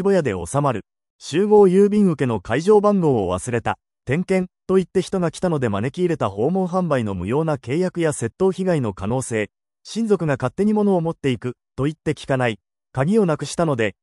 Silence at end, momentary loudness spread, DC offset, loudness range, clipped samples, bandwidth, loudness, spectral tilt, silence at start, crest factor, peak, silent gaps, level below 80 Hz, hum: 0.1 s; 10 LU; under 0.1%; 4 LU; under 0.1%; 12 kHz; -20 LUFS; -6.5 dB/octave; 0 s; 16 dB; -4 dBFS; 1.10-1.19 s; -50 dBFS; none